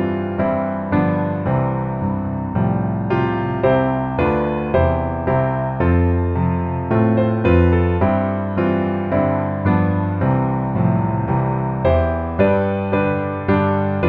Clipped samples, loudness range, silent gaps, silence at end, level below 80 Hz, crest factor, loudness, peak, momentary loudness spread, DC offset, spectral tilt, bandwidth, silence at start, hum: under 0.1%; 2 LU; none; 0 s; -34 dBFS; 14 dB; -18 LUFS; -4 dBFS; 4 LU; under 0.1%; -11 dB/octave; 4.6 kHz; 0 s; none